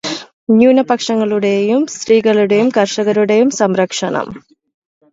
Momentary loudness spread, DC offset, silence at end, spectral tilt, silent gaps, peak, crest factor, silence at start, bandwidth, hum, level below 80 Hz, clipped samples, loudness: 9 LU; under 0.1%; 0.75 s; -5 dB/octave; 0.33-0.47 s; 0 dBFS; 14 dB; 0.05 s; 8 kHz; none; -58 dBFS; under 0.1%; -13 LUFS